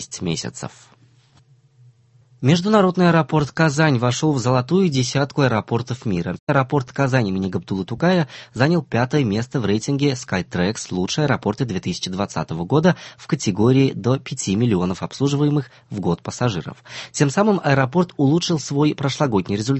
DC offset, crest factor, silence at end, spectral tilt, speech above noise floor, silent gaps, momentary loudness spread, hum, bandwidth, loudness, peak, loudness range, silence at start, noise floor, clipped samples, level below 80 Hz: under 0.1%; 18 dB; 0 s; -6 dB/octave; 35 dB; 6.39-6.47 s; 8 LU; none; 8.6 kHz; -20 LUFS; -2 dBFS; 4 LU; 0 s; -54 dBFS; under 0.1%; -48 dBFS